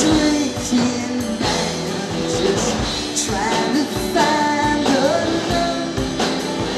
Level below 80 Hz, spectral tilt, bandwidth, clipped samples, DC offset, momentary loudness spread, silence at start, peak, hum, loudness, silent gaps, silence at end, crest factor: -38 dBFS; -4 dB/octave; 14.5 kHz; under 0.1%; under 0.1%; 6 LU; 0 s; -2 dBFS; none; -19 LUFS; none; 0 s; 16 dB